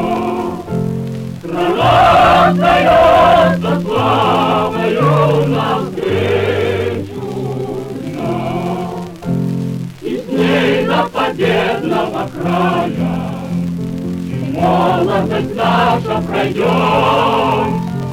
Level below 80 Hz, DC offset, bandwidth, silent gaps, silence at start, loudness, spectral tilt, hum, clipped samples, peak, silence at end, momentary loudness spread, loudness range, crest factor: -40 dBFS; under 0.1%; 16 kHz; none; 0 s; -14 LUFS; -6.5 dB/octave; none; under 0.1%; -2 dBFS; 0 s; 13 LU; 8 LU; 12 dB